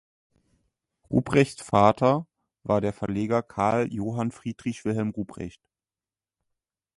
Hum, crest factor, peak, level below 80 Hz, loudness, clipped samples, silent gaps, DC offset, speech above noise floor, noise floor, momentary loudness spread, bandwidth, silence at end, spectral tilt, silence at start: none; 24 dB; -4 dBFS; -54 dBFS; -25 LUFS; under 0.1%; none; under 0.1%; over 65 dB; under -90 dBFS; 13 LU; 11.5 kHz; 1.5 s; -7 dB/octave; 1.1 s